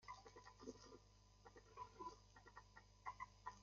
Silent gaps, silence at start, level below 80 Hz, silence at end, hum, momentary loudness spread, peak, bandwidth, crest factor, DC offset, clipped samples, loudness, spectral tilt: none; 0 s; -74 dBFS; 0 s; 50 Hz at -70 dBFS; 11 LU; -38 dBFS; 7.2 kHz; 22 dB; under 0.1%; under 0.1%; -60 LUFS; -3.5 dB/octave